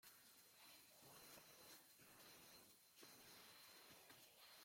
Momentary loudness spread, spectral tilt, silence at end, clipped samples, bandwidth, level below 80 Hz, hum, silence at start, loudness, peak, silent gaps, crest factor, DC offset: 3 LU; -1 dB/octave; 0 s; under 0.1%; 16.5 kHz; under -90 dBFS; none; 0 s; -64 LUFS; -50 dBFS; none; 18 dB; under 0.1%